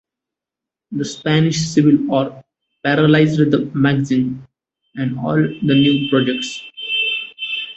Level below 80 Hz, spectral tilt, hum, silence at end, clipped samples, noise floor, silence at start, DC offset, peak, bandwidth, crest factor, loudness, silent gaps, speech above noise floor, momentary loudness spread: -54 dBFS; -6 dB/octave; none; 0.05 s; under 0.1%; -86 dBFS; 0.9 s; under 0.1%; -2 dBFS; 8.2 kHz; 16 dB; -17 LUFS; none; 70 dB; 12 LU